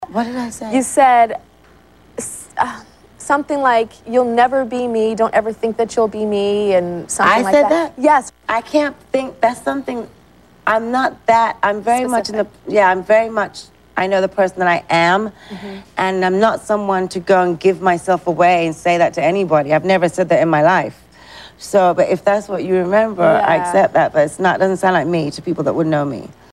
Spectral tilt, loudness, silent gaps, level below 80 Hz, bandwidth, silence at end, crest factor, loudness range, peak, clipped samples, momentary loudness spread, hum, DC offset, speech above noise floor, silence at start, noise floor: -5 dB/octave; -16 LUFS; none; -52 dBFS; 13.5 kHz; 0.2 s; 14 dB; 3 LU; -2 dBFS; under 0.1%; 10 LU; none; 0.1%; 32 dB; 0 s; -48 dBFS